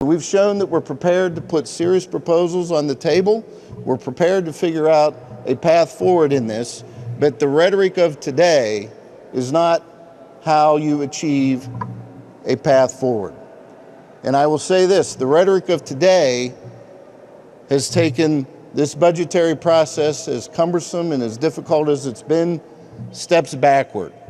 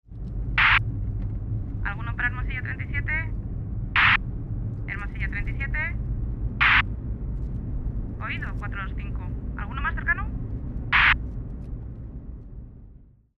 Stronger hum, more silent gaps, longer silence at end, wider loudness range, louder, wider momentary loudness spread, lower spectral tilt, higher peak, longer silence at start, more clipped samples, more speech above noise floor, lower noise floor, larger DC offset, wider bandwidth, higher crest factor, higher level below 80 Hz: neither; neither; second, 0.05 s vs 0.35 s; about the same, 3 LU vs 5 LU; first, -17 LUFS vs -25 LUFS; second, 12 LU vs 18 LU; about the same, -5.5 dB/octave vs -6.5 dB/octave; first, -2 dBFS vs -6 dBFS; about the same, 0 s vs 0.1 s; neither; first, 26 dB vs 22 dB; second, -42 dBFS vs -50 dBFS; neither; first, 13 kHz vs 6 kHz; about the same, 16 dB vs 20 dB; second, -60 dBFS vs -32 dBFS